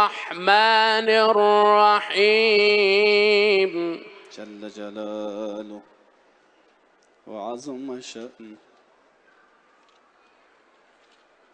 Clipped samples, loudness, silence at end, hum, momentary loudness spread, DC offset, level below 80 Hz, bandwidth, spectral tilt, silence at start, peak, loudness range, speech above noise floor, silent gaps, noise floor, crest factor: under 0.1%; -18 LUFS; 3 s; none; 22 LU; under 0.1%; -78 dBFS; 9.4 kHz; -3.5 dB/octave; 0 s; -2 dBFS; 21 LU; 40 dB; none; -60 dBFS; 20 dB